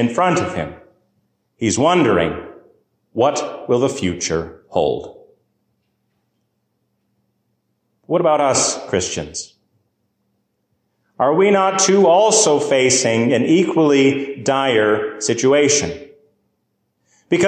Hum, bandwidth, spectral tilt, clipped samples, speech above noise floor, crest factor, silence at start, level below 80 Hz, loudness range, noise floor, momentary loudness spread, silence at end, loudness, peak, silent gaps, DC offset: none; 10 kHz; -3.5 dB/octave; under 0.1%; 54 dB; 16 dB; 0 s; -48 dBFS; 10 LU; -70 dBFS; 12 LU; 0 s; -16 LUFS; -4 dBFS; none; under 0.1%